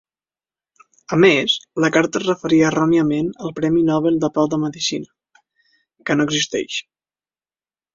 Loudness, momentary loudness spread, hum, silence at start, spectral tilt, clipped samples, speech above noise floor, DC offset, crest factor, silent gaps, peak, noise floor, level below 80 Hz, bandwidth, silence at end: -18 LUFS; 9 LU; none; 1.1 s; -4.5 dB/octave; under 0.1%; over 72 dB; under 0.1%; 18 dB; none; -2 dBFS; under -90 dBFS; -58 dBFS; 7.6 kHz; 1.15 s